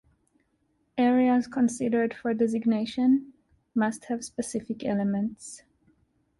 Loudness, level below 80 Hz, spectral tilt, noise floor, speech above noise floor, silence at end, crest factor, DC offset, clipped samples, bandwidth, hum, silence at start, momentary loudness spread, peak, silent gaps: -27 LUFS; -64 dBFS; -5.5 dB/octave; -72 dBFS; 45 dB; 0.8 s; 14 dB; under 0.1%; under 0.1%; 11.5 kHz; none; 0.95 s; 10 LU; -14 dBFS; none